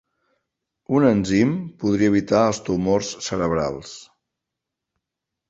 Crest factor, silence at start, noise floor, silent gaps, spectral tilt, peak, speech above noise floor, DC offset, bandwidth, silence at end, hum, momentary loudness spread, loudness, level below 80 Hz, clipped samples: 18 dB; 0.9 s; -84 dBFS; none; -6 dB/octave; -4 dBFS; 64 dB; under 0.1%; 8 kHz; 1.45 s; none; 10 LU; -21 LUFS; -50 dBFS; under 0.1%